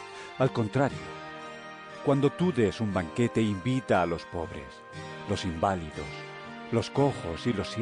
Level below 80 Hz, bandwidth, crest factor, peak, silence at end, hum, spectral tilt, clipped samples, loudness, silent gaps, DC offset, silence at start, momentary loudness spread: -56 dBFS; 10 kHz; 18 dB; -12 dBFS; 0 s; none; -6.5 dB/octave; under 0.1%; -29 LUFS; none; under 0.1%; 0 s; 15 LU